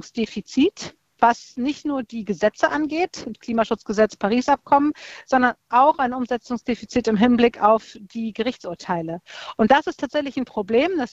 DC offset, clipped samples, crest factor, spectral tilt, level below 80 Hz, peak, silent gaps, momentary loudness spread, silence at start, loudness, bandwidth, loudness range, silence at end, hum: under 0.1%; under 0.1%; 20 dB; -5 dB/octave; -54 dBFS; -2 dBFS; none; 12 LU; 0.05 s; -21 LUFS; 8 kHz; 3 LU; 0.05 s; none